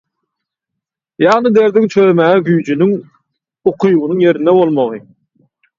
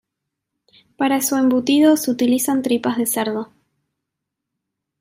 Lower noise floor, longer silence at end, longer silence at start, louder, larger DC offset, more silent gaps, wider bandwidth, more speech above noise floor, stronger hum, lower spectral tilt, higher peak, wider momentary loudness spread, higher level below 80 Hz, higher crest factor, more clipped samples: about the same, -79 dBFS vs -81 dBFS; second, 0.8 s vs 1.55 s; first, 1.2 s vs 1 s; first, -12 LUFS vs -18 LUFS; neither; neither; second, 7.4 kHz vs 16 kHz; first, 68 dB vs 64 dB; neither; first, -7.5 dB/octave vs -3.5 dB/octave; first, 0 dBFS vs -4 dBFS; about the same, 8 LU vs 9 LU; first, -60 dBFS vs -68 dBFS; about the same, 14 dB vs 16 dB; neither